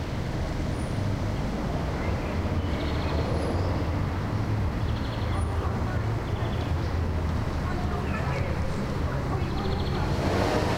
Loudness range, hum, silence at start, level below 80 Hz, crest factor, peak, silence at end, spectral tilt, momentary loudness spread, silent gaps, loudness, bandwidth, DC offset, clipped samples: 1 LU; none; 0 s; -34 dBFS; 18 dB; -10 dBFS; 0 s; -7 dB/octave; 2 LU; none; -29 LUFS; 15.5 kHz; 0.1%; under 0.1%